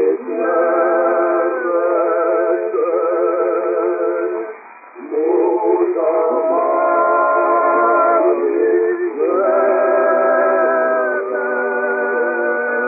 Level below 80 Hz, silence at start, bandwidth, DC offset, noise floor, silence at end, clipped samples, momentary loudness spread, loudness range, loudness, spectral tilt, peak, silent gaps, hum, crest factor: under -90 dBFS; 0 s; 2.6 kHz; under 0.1%; -37 dBFS; 0 s; under 0.1%; 5 LU; 3 LU; -16 LUFS; -7 dB/octave; -4 dBFS; none; none; 12 dB